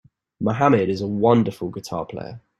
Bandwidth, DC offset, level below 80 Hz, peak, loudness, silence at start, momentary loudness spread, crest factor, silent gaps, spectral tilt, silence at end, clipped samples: 13 kHz; under 0.1%; -56 dBFS; -2 dBFS; -21 LUFS; 0.4 s; 13 LU; 20 dB; none; -7.5 dB/octave; 0.2 s; under 0.1%